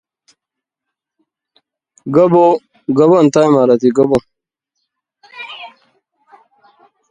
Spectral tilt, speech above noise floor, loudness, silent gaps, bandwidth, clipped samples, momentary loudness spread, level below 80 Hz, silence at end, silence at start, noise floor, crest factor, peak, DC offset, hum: -7 dB/octave; 72 dB; -12 LUFS; none; 9.6 kHz; under 0.1%; 22 LU; -54 dBFS; 1.45 s; 2.05 s; -82 dBFS; 16 dB; 0 dBFS; under 0.1%; none